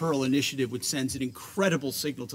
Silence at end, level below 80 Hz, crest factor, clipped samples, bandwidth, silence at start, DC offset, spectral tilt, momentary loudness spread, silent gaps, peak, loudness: 0 s; -62 dBFS; 18 dB; under 0.1%; 16 kHz; 0 s; under 0.1%; -4 dB/octave; 6 LU; none; -10 dBFS; -28 LUFS